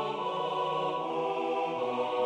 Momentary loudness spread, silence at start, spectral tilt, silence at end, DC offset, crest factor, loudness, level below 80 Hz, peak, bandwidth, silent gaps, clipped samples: 1 LU; 0 s; -5.5 dB/octave; 0 s; under 0.1%; 12 dB; -32 LUFS; -82 dBFS; -18 dBFS; 9.8 kHz; none; under 0.1%